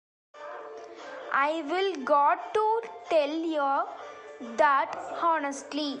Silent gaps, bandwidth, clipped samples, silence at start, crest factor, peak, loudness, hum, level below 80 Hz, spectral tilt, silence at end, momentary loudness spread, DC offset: none; 11 kHz; under 0.1%; 0.35 s; 18 dB; -12 dBFS; -27 LUFS; none; -78 dBFS; -2.5 dB/octave; 0 s; 19 LU; under 0.1%